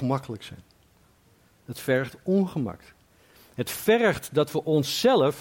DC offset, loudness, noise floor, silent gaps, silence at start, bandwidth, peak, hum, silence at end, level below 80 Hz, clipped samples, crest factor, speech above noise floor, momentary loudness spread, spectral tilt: under 0.1%; -25 LUFS; -60 dBFS; none; 0 s; 17 kHz; -10 dBFS; none; 0 s; -60 dBFS; under 0.1%; 16 dB; 36 dB; 18 LU; -5.5 dB/octave